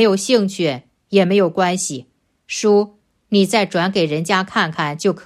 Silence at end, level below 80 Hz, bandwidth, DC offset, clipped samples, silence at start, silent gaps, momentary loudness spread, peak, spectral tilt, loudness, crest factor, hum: 0.05 s; -64 dBFS; 14 kHz; under 0.1%; under 0.1%; 0 s; none; 8 LU; -2 dBFS; -4.5 dB/octave; -17 LUFS; 16 dB; none